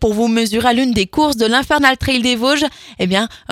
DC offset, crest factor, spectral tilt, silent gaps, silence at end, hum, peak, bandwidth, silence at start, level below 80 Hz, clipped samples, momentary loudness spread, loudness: under 0.1%; 16 dB; -4 dB/octave; none; 0.15 s; none; 0 dBFS; 16 kHz; 0 s; -36 dBFS; under 0.1%; 5 LU; -15 LUFS